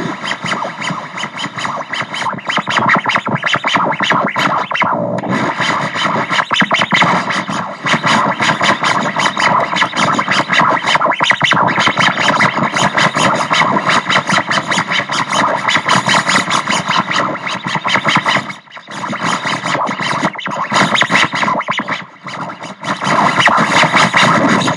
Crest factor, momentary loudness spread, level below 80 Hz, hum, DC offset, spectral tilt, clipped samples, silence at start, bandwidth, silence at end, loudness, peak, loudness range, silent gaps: 14 dB; 10 LU; -60 dBFS; none; under 0.1%; -3.5 dB/octave; under 0.1%; 0 s; 12 kHz; 0 s; -13 LUFS; 0 dBFS; 4 LU; none